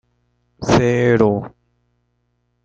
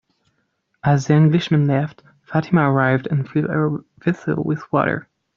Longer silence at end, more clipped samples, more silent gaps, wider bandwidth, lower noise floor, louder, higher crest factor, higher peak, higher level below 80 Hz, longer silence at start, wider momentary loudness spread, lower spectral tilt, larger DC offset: first, 1.15 s vs 0.35 s; neither; neither; first, 8.8 kHz vs 7.2 kHz; about the same, -67 dBFS vs -69 dBFS; first, -16 LUFS vs -19 LUFS; about the same, 20 dB vs 16 dB; about the same, 0 dBFS vs -2 dBFS; first, -44 dBFS vs -56 dBFS; second, 0.6 s vs 0.85 s; first, 13 LU vs 9 LU; second, -6.5 dB/octave vs -8 dB/octave; neither